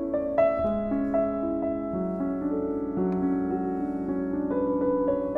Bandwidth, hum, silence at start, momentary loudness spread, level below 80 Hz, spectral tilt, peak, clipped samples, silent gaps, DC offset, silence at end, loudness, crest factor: 3.6 kHz; none; 0 s; 5 LU; -50 dBFS; -10.5 dB/octave; -12 dBFS; under 0.1%; none; under 0.1%; 0 s; -27 LUFS; 14 dB